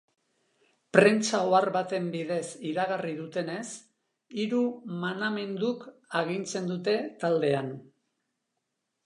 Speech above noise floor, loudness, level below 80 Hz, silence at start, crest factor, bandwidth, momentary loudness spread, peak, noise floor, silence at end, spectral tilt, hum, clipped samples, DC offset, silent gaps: 54 dB; -28 LUFS; -80 dBFS; 0.95 s; 26 dB; 11 kHz; 12 LU; -2 dBFS; -82 dBFS; 1.2 s; -5 dB/octave; none; under 0.1%; under 0.1%; none